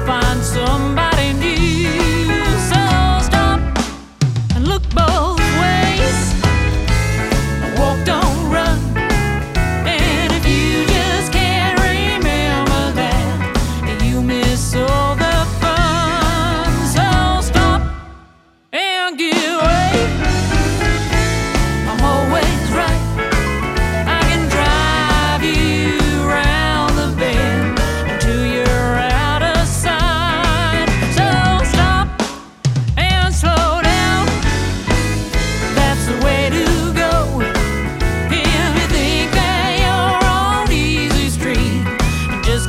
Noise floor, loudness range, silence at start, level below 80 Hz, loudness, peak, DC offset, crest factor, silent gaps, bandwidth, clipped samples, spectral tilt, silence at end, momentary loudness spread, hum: -48 dBFS; 2 LU; 0 s; -20 dBFS; -15 LUFS; 0 dBFS; under 0.1%; 14 dB; none; 16 kHz; under 0.1%; -5 dB/octave; 0 s; 4 LU; none